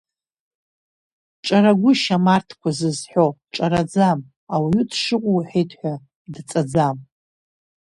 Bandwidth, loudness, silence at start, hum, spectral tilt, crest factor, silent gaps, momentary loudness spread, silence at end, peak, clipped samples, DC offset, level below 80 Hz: 11.5 kHz; -20 LUFS; 1.45 s; none; -6 dB/octave; 18 dB; 4.36-4.47 s, 6.15-6.25 s; 13 LU; 0.9 s; -2 dBFS; under 0.1%; under 0.1%; -54 dBFS